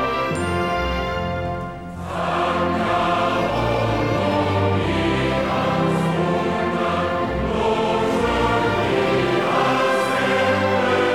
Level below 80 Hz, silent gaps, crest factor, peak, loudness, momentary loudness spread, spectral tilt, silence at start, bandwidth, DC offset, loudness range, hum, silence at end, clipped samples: -38 dBFS; none; 14 dB; -6 dBFS; -20 LUFS; 5 LU; -6 dB/octave; 0 s; 16.5 kHz; 0.3%; 3 LU; none; 0 s; under 0.1%